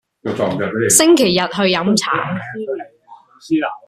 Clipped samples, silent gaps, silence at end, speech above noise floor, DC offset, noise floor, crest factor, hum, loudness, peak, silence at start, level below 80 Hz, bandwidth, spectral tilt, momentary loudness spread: under 0.1%; none; 0.1 s; 29 dB; under 0.1%; -45 dBFS; 16 dB; none; -16 LUFS; 0 dBFS; 0.25 s; -54 dBFS; 15 kHz; -3.5 dB/octave; 15 LU